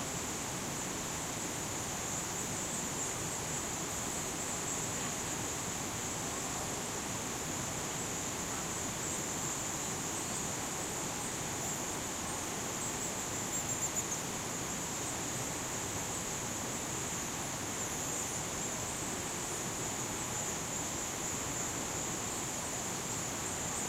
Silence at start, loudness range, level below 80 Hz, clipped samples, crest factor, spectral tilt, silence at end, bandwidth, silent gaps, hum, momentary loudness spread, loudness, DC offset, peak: 0 s; 1 LU; -58 dBFS; under 0.1%; 14 dB; -2.5 dB/octave; 0 s; 16 kHz; none; none; 2 LU; -36 LUFS; under 0.1%; -24 dBFS